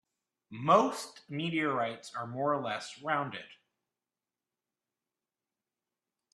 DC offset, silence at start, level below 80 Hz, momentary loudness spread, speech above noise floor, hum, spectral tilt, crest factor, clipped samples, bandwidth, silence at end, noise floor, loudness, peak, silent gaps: under 0.1%; 0.5 s; -80 dBFS; 15 LU; over 58 dB; none; -5 dB/octave; 24 dB; under 0.1%; 13 kHz; 2.8 s; under -90 dBFS; -32 LUFS; -12 dBFS; none